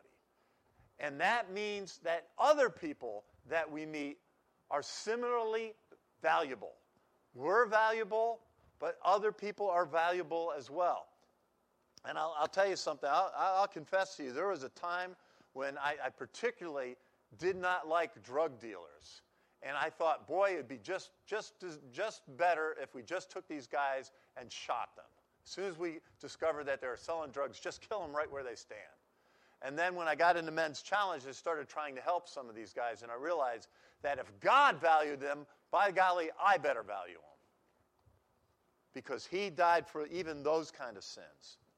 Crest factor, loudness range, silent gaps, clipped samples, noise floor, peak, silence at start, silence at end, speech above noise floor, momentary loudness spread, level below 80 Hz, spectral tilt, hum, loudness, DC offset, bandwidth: 20 dB; 7 LU; none; under 0.1%; -76 dBFS; -16 dBFS; 1 s; 0.25 s; 40 dB; 16 LU; -80 dBFS; -3.5 dB/octave; none; -36 LUFS; under 0.1%; 12.5 kHz